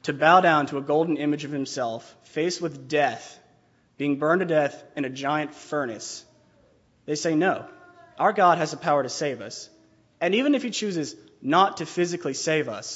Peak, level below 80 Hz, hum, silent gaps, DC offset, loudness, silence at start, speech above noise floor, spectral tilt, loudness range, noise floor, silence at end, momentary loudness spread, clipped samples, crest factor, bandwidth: -4 dBFS; -74 dBFS; none; none; under 0.1%; -24 LUFS; 0.05 s; 38 dB; -4.5 dB/octave; 4 LU; -62 dBFS; 0 s; 15 LU; under 0.1%; 22 dB; 8 kHz